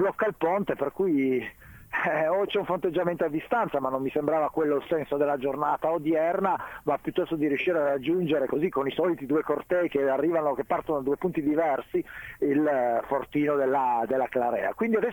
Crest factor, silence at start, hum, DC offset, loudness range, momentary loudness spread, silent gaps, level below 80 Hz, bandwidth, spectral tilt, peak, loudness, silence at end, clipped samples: 16 dB; 0 s; none; under 0.1%; 1 LU; 4 LU; none; -62 dBFS; 18 kHz; -7.5 dB/octave; -10 dBFS; -27 LUFS; 0 s; under 0.1%